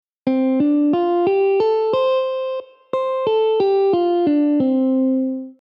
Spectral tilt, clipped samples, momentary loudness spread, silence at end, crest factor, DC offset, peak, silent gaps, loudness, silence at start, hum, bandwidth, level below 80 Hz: -8.5 dB/octave; under 0.1%; 7 LU; 0.1 s; 12 dB; under 0.1%; -6 dBFS; none; -18 LUFS; 0.25 s; none; 5.6 kHz; -66 dBFS